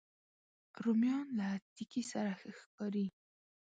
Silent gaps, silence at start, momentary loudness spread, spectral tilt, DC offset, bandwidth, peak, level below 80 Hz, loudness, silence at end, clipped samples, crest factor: 1.62-1.76 s, 2.66-2.78 s; 0.75 s; 11 LU; -6 dB/octave; under 0.1%; 9 kHz; -24 dBFS; -86 dBFS; -39 LUFS; 0.7 s; under 0.1%; 16 dB